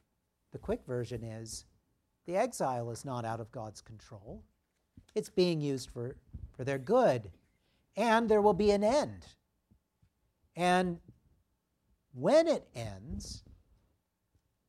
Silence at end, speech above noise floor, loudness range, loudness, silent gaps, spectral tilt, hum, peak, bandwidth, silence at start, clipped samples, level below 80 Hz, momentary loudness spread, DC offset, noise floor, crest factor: 1.3 s; 48 dB; 8 LU; -32 LUFS; none; -5.5 dB/octave; none; -14 dBFS; 14 kHz; 0.55 s; under 0.1%; -58 dBFS; 23 LU; under 0.1%; -79 dBFS; 20 dB